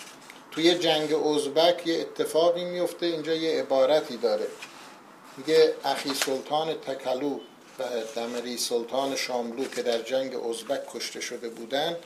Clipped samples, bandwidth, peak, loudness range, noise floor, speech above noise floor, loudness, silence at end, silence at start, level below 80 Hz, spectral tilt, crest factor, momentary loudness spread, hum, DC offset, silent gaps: under 0.1%; 15.5 kHz; -6 dBFS; 5 LU; -48 dBFS; 22 dB; -27 LUFS; 0 s; 0 s; -78 dBFS; -3 dB/octave; 20 dB; 14 LU; none; under 0.1%; none